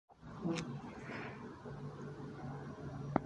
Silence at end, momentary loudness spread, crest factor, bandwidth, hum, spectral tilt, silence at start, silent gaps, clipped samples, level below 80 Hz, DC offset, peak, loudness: 0 s; 8 LU; 30 dB; 11 kHz; none; -6.5 dB/octave; 0.1 s; none; under 0.1%; -64 dBFS; under 0.1%; -14 dBFS; -45 LUFS